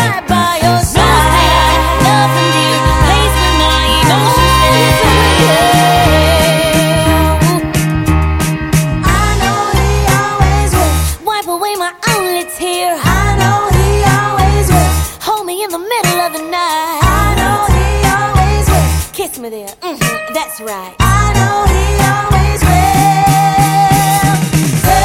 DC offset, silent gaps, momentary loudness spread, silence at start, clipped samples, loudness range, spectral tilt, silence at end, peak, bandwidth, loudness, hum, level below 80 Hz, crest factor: under 0.1%; none; 8 LU; 0 s; under 0.1%; 5 LU; -4.5 dB/octave; 0 s; 0 dBFS; 17 kHz; -11 LUFS; none; -18 dBFS; 10 dB